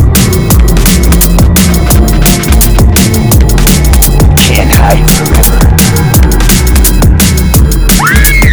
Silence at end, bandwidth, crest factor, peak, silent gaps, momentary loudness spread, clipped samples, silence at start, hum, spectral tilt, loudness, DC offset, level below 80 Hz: 0 s; over 20 kHz; 4 dB; 0 dBFS; none; 2 LU; 5%; 0 s; none; -4.5 dB/octave; -6 LUFS; 1%; -8 dBFS